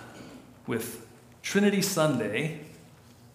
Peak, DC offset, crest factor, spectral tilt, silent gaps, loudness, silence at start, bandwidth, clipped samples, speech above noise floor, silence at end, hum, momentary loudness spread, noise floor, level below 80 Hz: -12 dBFS; under 0.1%; 18 dB; -4.5 dB/octave; none; -28 LUFS; 0 s; 15.5 kHz; under 0.1%; 26 dB; 0.55 s; none; 22 LU; -53 dBFS; -68 dBFS